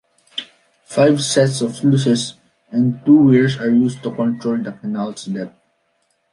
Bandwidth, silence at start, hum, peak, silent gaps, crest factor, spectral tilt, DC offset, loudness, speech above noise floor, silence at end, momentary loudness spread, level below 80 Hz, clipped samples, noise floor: 11.5 kHz; 0.35 s; none; -2 dBFS; none; 16 dB; -6 dB/octave; under 0.1%; -17 LUFS; 50 dB; 0.85 s; 15 LU; -60 dBFS; under 0.1%; -65 dBFS